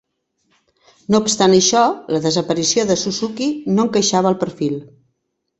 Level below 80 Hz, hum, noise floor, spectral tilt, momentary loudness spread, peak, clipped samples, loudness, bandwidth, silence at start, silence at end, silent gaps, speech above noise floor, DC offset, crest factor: -56 dBFS; none; -72 dBFS; -4 dB/octave; 10 LU; -2 dBFS; under 0.1%; -16 LUFS; 8.4 kHz; 1.1 s; 0.75 s; none; 56 dB; under 0.1%; 18 dB